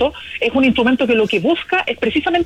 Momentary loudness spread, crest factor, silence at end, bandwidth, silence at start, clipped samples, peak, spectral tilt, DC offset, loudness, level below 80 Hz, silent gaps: 5 LU; 12 dB; 0 s; 11 kHz; 0 s; under 0.1%; -4 dBFS; -6 dB/octave; under 0.1%; -16 LUFS; -46 dBFS; none